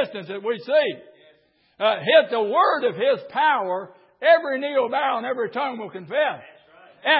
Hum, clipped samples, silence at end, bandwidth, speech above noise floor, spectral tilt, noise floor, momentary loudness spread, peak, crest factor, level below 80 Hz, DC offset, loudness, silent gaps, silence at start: none; under 0.1%; 0 s; 5.6 kHz; 39 dB; -8.5 dB/octave; -60 dBFS; 11 LU; -4 dBFS; 18 dB; -80 dBFS; under 0.1%; -22 LUFS; none; 0 s